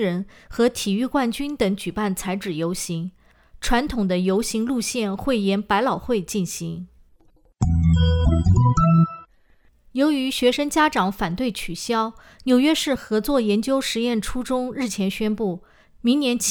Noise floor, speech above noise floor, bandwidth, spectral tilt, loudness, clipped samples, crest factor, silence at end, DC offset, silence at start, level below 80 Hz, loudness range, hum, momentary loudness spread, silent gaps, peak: -57 dBFS; 35 dB; over 20 kHz; -5.5 dB/octave; -22 LUFS; under 0.1%; 16 dB; 0 s; under 0.1%; 0 s; -36 dBFS; 4 LU; none; 10 LU; none; -6 dBFS